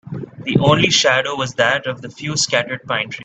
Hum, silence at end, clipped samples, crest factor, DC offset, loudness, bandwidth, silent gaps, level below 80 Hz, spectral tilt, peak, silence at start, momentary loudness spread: none; 0 s; under 0.1%; 18 dB; under 0.1%; -16 LUFS; 9.2 kHz; none; -50 dBFS; -3.5 dB/octave; 0 dBFS; 0.05 s; 15 LU